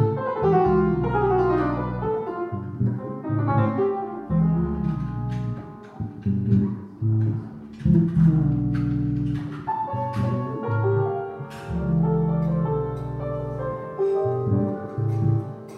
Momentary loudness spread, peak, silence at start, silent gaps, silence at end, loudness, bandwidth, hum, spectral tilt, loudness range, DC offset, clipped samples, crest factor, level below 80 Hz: 10 LU; -8 dBFS; 0 s; none; 0 s; -24 LUFS; 5.4 kHz; none; -10.5 dB/octave; 3 LU; under 0.1%; under 0.1%; 16 dB; -42 dBFS